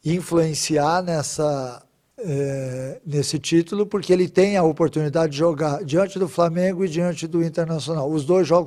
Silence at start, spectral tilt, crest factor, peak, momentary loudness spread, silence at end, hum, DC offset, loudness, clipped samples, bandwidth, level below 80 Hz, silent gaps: 0.05 s; -5.5 dB/octave; 16 dB; -4 dBFS; 8 LU; 0 s; none; under 0.1%; -21 LUFS; under 0.1%; 14.5 kHz; -56 dBFS; none